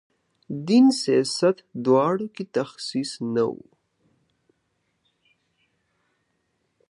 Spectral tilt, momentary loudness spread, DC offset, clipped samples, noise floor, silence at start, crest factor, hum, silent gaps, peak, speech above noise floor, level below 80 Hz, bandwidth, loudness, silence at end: -5.5 dB/octave; 11 LU; under 0.1%; under 0.1%; -73 dBFS; 0.5 s; 18 dB; none; none; -8 dBFS; 51 dB; -74 dBFS; 11.5 kHz; -23 LUFS; 3.35 s